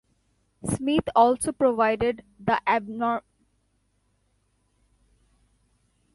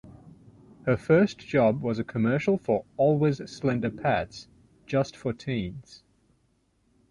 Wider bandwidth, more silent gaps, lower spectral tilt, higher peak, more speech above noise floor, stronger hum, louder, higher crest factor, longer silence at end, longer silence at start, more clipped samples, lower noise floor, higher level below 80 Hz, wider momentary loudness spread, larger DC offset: about the same, 11.5 kHz vs 11 kHz; neither; second, -5 dB/octave vs -7.5 dB/octave; about the same, -8 dBFS vs -8 dBFS; about the same, 46 dB vs 43 dB; first, 50 Hz at -60 dBFS vs none; about the same, -24 LUFS vs -26 LUFS; about the same, 20 dB vs 18 dB; first, 2.95 s vs 1.15 s; first, 0.65 s vs 0.05 s; neither; about the same, -70 dBFS vs -69 dBFS; about the same, -54 dBFS vs -56 dBFS; about the same, 11 LU vs 11 LU; neither